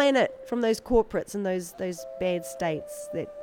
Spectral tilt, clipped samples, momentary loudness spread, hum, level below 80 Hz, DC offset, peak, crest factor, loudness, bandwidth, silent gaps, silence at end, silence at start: -5 dB/octave; under 0.1%; 10 LU; none; -48 dBFS; under 0.1%; -10 dBFS; 18 dB; -28 LUFS; 18.5 kHz; none; 0 s; 0 s